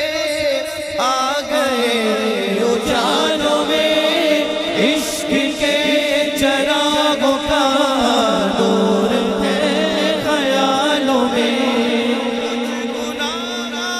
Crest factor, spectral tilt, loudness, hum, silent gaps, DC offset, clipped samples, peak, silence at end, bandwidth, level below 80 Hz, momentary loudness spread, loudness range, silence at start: 14 dB; -3.5 dB/octave; -16 LUFS; none; none; under 0.1%; under 0.1%; -2 dBFS; 0 s; 15.5 kHz; -46 dBFS; 6 LU; 2 LU; 0 s